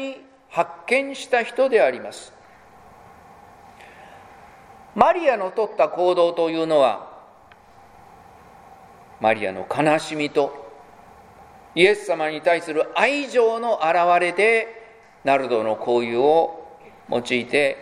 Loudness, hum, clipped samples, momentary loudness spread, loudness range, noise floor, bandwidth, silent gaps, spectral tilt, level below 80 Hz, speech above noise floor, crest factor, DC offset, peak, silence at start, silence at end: -20 LUFS; none; under 0.1%; 11 LU; 6 LU; -50 dBFS; 12 kHz; none; -4.5 dB/octave; -62 dBFS; 30 dB; 22 dB; under 0.1%; 0 dBFS; 0 s; 0 s